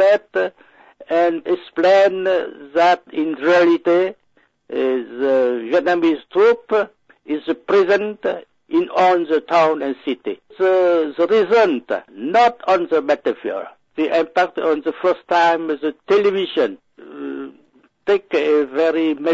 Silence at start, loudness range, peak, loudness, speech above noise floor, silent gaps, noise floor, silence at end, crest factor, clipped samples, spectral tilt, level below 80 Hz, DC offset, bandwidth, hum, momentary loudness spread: 0 s; 3 LU; -6 dBFS; -18 LUFS; 41 dB; none; -58 dBFS; 0 s; 12 dB; under 0.1%; -5.5 dB/octave; -66 dBFS; under 0.1%; 7.8 kHz; none; 11 LU